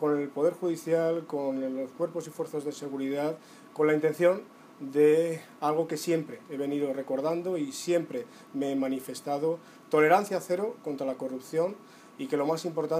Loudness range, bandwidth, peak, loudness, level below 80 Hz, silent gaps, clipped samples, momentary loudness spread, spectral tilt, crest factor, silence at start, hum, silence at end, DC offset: 4 LU; 15.5 kHz; -10 dBFS; -29 LUFS; -88 dBFS; none; under 0.1%; 11 LU; -5.5 dB/octave; 20 dB; 0 s; none; 0 s; under 0.1%